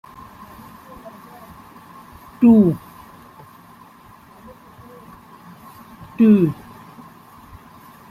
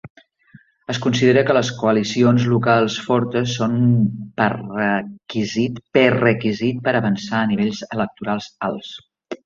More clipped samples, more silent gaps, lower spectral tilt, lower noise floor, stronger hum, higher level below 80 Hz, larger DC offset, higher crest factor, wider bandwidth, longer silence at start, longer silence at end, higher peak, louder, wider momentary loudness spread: neither; second, none vs 0.10-0.15 s; first, -9.5 dB/octave vs -6 dB/octave; second, -46 dBFS vs -50 dBFS; neither; about the same, -54 dBFS vs -56 dBFS; neither; about the same, 20 dB vs 18 dB; first, 14.5 kHz vs 7.4 kHz; first, 1.05 s vs 0.05 s; first, 1.55 s vs 0.1 s; about the same, -4 dBFS vs -2 dBFS; first, -15 LUFS vs -19 LUFS; first, 29 LU vs 11 LU